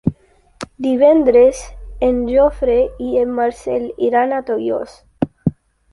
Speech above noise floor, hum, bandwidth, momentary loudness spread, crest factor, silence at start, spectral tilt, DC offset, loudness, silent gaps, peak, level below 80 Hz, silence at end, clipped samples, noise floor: 33 dB; none; 11.5 kHz; 13 LU; 14 dB; 0.05 s; -7 dB/octave; under 0.1%; -16 LUFS; none; -2 dBFS; -38 dBFS; 0.4 s; under 0.1%; -48 dBFS